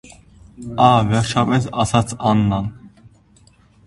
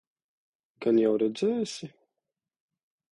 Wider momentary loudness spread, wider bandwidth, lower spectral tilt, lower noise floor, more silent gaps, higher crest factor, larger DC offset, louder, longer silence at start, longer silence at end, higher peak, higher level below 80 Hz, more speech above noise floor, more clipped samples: about the same, 15 LU vs 15 LU; about the same, 11.5 kHz vs 11 kHz; about the same, -6 dB/octave vs -6 dB/octave; second, -52 dBFS vs -87 dBFS; neither; about the same, 18 dB vs 18 dB; neither; first, -17 LUFS vs -27 LUFS; second, 0.6 s vs 0.8 s; second, 1 s vs 1.25 s; first, 0 dBFS vs -12 dBFS; first, -42 dBFS vs -76 dBFS; second, 35 dB vs 61 dB; neither